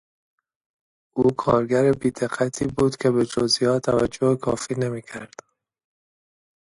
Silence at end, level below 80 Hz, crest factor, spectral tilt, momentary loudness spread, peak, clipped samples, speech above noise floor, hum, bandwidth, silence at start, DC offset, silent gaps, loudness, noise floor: 1.4 s; -52 dBFS; 18 dB; -5.5 dB/octave; 11 LU; -6 dBFS; under 0.1%; over 68 dB; none; 11.5 kHz; 1.15 s; under 0.1%; none; -22 LUFS; under -90 dBFS